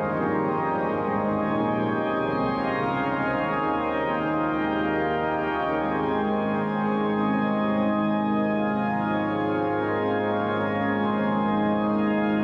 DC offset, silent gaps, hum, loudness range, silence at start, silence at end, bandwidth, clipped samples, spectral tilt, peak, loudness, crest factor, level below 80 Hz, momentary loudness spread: under 0.1%; none; none; 1 LU; 0 s; 0 s; 5.4 kHz; under 0.1%; -9 dB/octave; -14 dBFS; -25 LUFS; 12 dB; -52 dBFS; 2 LU